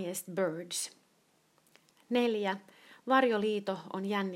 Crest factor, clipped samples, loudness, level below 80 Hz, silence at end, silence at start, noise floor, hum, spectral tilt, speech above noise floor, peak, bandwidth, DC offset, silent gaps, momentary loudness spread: 22 dB; under 0.1%; -32 LUFS; -86 dBFS; 0 s; 0 s; -70 dBFS; none; -4 dB/octave; 38 dB; -12 dBFS; 16 kHz; under 0.1%; none; 11 LU